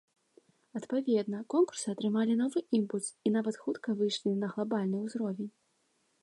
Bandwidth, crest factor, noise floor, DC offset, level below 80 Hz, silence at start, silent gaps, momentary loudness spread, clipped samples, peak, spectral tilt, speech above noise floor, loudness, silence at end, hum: 11.5 kHz; 16 dB; -74 dBFS; under 0.1%; -84 dBFS; 0.75 s; none; 7 LU; under 0.1%; -18 dBFS; -5.5 dB/octave; 43 dB; -32 LUFS; 0.75 s; none